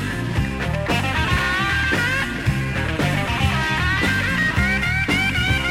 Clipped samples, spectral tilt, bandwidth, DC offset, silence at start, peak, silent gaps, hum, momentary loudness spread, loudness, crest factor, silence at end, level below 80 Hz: under 0.1%; -5 dB/octave; 16.5 kHz; under 0.1%; 0 s; -6 dBFS; none; none; 5 LU; -20 LUFS; 14 dB; 0 s; -32 dBFS